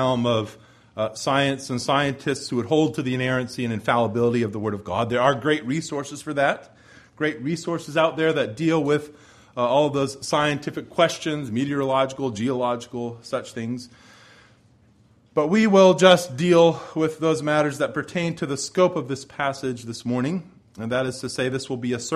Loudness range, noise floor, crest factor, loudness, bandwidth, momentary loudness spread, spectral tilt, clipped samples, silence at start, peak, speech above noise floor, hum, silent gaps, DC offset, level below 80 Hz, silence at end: 7 LU; -57 dBFS; 20 dB; -23 LUFS; 14 kHz; 11 LU; -5 dB/octave; under 0.1%; 0 s; -2 dBFS; 34 dB; none; none; under 0.1%; -60 dBFS; 0 s